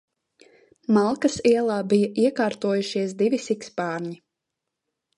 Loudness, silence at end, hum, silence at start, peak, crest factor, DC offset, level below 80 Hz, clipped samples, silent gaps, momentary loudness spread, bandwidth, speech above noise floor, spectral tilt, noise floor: -23 LUFS; 1 s; none; 0.9 s; -6 dBFS; 18 dB; under 0.1%; -64 dBFS; under 0.1%; none; 10 LU; 11 kHz; 61 dB; -5.5 dB/octave; -83 dBFS